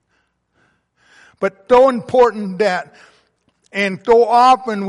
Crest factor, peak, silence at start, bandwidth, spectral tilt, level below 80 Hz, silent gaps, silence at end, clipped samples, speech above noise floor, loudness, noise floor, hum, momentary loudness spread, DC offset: 14 dB; -2 dBFS; 1.4 s; 11.5 kHz; -5.5 dB/octave; -54 dBFS; none; 0 s; under 0.1%; 51 dB; -14 LUFS; -65 dBFS; none; 12 LU; under 0.1%